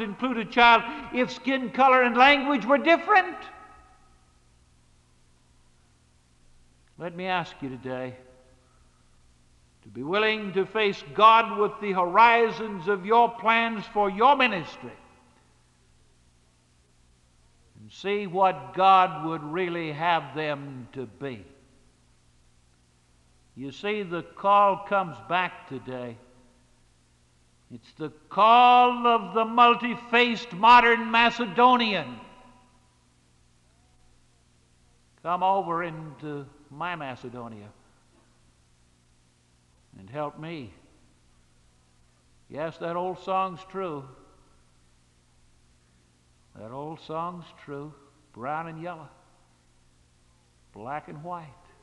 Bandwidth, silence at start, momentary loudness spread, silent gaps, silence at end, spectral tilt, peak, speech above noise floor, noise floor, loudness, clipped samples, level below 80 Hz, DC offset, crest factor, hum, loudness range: 10.5 kHz; 0 s; 22 LU; none; 0.35 s; -5.5 dB/octave; -4 dBFS; 39 dB; -63 dBFS; -23 LUFS; under 0.1%; -62 dBFS; under 0.1%; 22 dB; 60 Hz at -55 dBFS; 20 LU